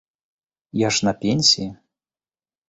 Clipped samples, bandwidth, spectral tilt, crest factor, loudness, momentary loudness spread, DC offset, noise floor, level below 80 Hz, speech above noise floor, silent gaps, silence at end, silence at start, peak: under 0.1%; 8.2 kHz; -3.5 dB/octave; 20 dB; -18 LUFS; 13 LU; under 0.1%; under -90 dBFS; -56 dBFS; over 70 dB; none; 0.95 s; 0.75 s; -4 dBFS